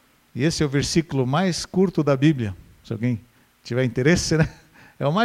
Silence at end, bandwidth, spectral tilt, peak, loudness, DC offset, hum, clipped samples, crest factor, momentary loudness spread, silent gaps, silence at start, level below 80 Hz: 0 s; 14.5 kHz; -5.5 dB/octave; -6 dBFS; -22 LUFS; under 0.1%; none; under 0.1%; 16 dB; 11 LU; none; 0.35 s; -46 dBFS